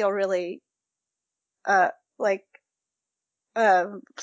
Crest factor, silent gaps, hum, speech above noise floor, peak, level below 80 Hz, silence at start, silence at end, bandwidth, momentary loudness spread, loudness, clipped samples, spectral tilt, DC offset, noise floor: 18 dB; none; none; 63 dB; -10 dBFS; under -90 dBFS; 0 s; 0 s; 7.8 kHz; 14 LU; -24 LUFS; under 0.1%; -4.5 dB/octave; under 0.1%; -86 dBFS